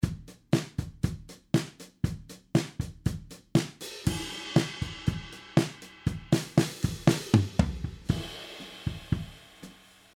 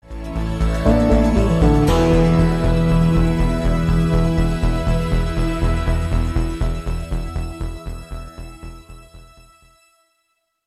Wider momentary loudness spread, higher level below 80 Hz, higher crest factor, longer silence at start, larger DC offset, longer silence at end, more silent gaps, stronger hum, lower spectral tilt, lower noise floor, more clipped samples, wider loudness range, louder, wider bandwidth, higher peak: about the same, 16 LU vs 18 LU; second, -46 dBFS vs -22 dBFS; first, 24 dB vs 16 dB; about the same, 0 s vs 0.05 s; neither; second, 0.45 s vs 1.45 s; neither; neither; second, -6 dB/octave vs -7.5 dB/octave; second, -52 dBFS vs -70 dBFS; neither; second, 4 LU vs 15 LU; second, -31 LUFS vs -19 LUFS; first, 16.5 kHz vs 12.5 kHz; second, -6 dBFS vs -2 dBFS